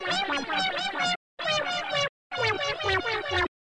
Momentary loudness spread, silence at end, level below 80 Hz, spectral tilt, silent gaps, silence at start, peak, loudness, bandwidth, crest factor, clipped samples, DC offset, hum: 2 LU; 0.2 s; -54 dBFS; -3 dB/octave; 1.16-1.37 s, 2.09-2.30 s; 0 s; -16 dBFS; -27 LUFS; 11 kHz; 12 dB; under 0.1%; under 0.1%; none